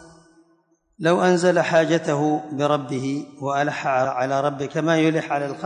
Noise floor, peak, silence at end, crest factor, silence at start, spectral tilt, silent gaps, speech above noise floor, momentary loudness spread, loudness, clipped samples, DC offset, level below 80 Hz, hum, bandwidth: -63 dBFS; -6 dBFS; 0 s; 16 dB; 0 s; -6 dB/octave; none; 42 dB; 8 LU; -21 LUFS; under 0.1%; under 0.1%; -68 dBFS; none; 10 kHz